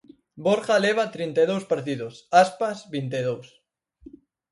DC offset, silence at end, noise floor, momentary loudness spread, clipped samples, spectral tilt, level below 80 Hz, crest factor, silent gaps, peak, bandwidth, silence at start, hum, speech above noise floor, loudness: under 0.1%; 1.05 s; -51 dBFS; 12 LU; under 0.1%; -5 dB/octave; -68 dBFS; 22 dB; none; -4 dBFS; 11.5 kHz; 0.35 s; none; 28 dB; -24 LUFS